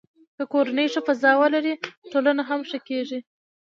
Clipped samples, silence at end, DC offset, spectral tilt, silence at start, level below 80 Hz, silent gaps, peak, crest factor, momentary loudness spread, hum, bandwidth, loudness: under 0.1%; 0.6 s; under 0.1%; -3.5 dB/octave; 0.4 s; -80 dBFS; 1.97-2.02 s; -4 dBFS; 20 dB; 14 LU; none; 7.4 kHz; -23 LUFS